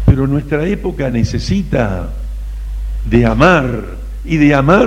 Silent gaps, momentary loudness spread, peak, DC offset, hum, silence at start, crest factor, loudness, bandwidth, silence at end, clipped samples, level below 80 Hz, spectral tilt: none; 16 LU; 0 dBFS; under 0.1%; 50 Hz at -20 dBFS; 0 s; 12 dB; -14 LUFS; 11.5 kHz; 0 s; under 0.1%; -22 dBFS; -7.5 dB/octave